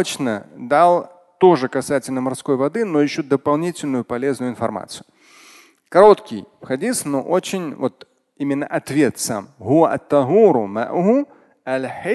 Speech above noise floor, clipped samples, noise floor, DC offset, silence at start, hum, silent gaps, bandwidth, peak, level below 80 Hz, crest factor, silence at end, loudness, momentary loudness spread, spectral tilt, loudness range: 31 dB; under 0.1%; -48 dBFS; under 0.1%; 0 s; none; none; 12.5 kHz; 0 dBFS; -62 dBFS; 18 dB; 0 s; -18 LUFS; 14 LU; -5.5 dB/octave; 4 LU